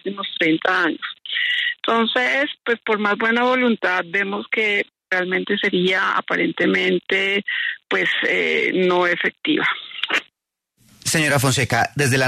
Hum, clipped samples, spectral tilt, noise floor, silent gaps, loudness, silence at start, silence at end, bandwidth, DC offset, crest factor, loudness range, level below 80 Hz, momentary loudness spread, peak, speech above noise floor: none; under 0.1%; -4 dB/octave; -77 dBFS; none; -19 LUFS; 0.05 s; 0 s; 13.5 kHz; under 0.1%; 16 dB; 1 LU; -58 dBFS; 5 LU; -4 dBFS; 57 dB